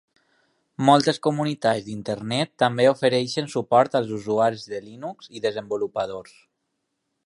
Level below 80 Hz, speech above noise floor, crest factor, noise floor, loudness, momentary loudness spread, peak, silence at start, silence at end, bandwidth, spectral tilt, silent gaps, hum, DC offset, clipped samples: -66 dBFS; 54 dB; 22 dB; -77 dBFS; -23 LUFS; 16 LU; -2 dBFS; 0.8 s; 1.05 s; 11.5 kHz; -5.5 dB/octave; none; none; under 0.1%; under 0.1%